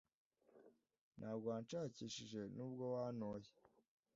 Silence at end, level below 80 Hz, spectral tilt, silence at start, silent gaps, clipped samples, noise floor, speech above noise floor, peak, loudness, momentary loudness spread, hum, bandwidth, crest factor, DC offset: 0.65 s; -82 dBFS; -6 dB/octave; 0.55 s; 1.01-1.11 s; under 0.1%; -71 dBFS; 23 dB; -32 dBFS; -49 LUFS; 8 LU; none; 7.4 kHz; 18 dB; under 0.1%